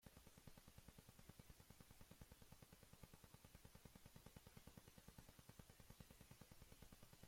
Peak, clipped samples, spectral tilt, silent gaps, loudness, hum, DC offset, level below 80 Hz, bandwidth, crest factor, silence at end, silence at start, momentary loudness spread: -48 dBFS; under 0.1%; -4 dB/octave; none; -67 LUFS; none; under 0.1%; -74 dBFS; 16.5 kHz; 18 dB; 0 s; 0 s; 2 LU